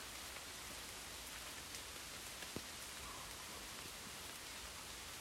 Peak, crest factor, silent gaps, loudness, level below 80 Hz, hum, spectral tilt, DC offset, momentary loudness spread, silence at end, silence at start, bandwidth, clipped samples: -32 dBFS; 20 dB; none; -49 LUFS; -64 dBFS; none; -1.5 dB/octave; under 0.1%; 1 LU; 0 s; 0 s; 16 kHz; under 0.1%